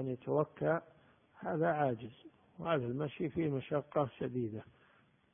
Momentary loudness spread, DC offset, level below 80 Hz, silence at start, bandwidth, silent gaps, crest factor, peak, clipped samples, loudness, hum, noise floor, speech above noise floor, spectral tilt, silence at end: 10 LU; under 0.1%; -70 dBFS; 0 s; 3.6 kHz; none; 20 dB; -18 dBFS; under 0.1%; -37 LUFS; none; -69 dBFS; 32 dB; -4.5 dB/octave; 0.7 s